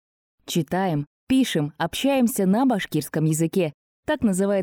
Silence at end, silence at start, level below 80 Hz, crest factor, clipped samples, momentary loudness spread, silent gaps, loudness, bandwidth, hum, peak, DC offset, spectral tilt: 0 s; 0.5 s; -54 dBFS; 12 dB; under 0.1%; 7 LU; 1.07-1.27 s, 3.74-4.03 s; -23 LUFS; 18.5 kHz; none; -12 dBFS; under 0.1%; -5.5 dB/octave